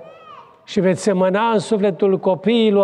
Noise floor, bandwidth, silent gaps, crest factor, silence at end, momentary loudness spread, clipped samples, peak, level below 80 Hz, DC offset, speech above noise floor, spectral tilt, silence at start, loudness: -42 dBFS; 11 kHz; none; 12 dB; 0 s; 3 LU; under 0.1%; -6 dBFS; -64 dBFS; under 0.1%; 26 dB; -6 dB/octave; 0 s; -18 LUFS